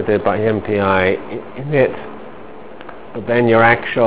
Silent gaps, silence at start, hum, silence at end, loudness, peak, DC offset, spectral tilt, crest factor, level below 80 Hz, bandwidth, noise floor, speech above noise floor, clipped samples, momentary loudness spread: none; 0 s; none; 0 s; -15 LUFS; 0 dBFS; 2%; -10 dB/octave; 16 dB; -44 dBFS; 4 kHz; -36 dBFS; 20 dB; under 0.1%; 23 LU